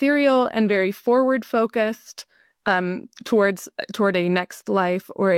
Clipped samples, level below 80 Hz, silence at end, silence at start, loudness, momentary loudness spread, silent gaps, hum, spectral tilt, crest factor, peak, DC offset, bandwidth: under 0.1%; -66 dBFS; 0 s; 0 s; -21 LUFS; 12 LU; none; none; -6 dB/octave; 14 dB; -6 dBFS; under 0.1%; 16.5 kHz